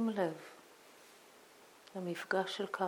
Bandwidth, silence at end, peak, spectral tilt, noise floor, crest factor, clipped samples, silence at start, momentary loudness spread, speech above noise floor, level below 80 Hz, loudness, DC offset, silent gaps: 19.5 kHz; 0 s; -20 dBFS; -5 dB/octave; -61 dBFS; 20 dB; under 0.1%; 0 s; 23 LU; 23 dB; under -90 dBFS; -39 LUFS; under 0.1%; none